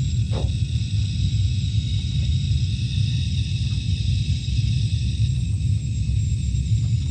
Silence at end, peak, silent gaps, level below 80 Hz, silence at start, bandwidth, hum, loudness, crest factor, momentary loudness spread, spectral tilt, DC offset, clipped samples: 0 s; -10 dBFS; none; -28 dBFS; 0 s; 9 kHz; none; -23 LUFS; 12 dB; 2 LU; -6 dB/octave; under 0.1%; under 0.1%